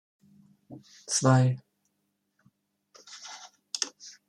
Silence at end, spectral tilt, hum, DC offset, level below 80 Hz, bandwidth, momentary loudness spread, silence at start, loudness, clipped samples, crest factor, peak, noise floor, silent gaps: 0.2 s; -4.5 dB/octave; 50 Hz at -65 dBFS; under 0.1%; -72 dBFS; 11 kHz; 25 LU; 0.7 s; -27 LUFS; under 0.1%; 24 dB; -8 dBFS; -78 dBFS; none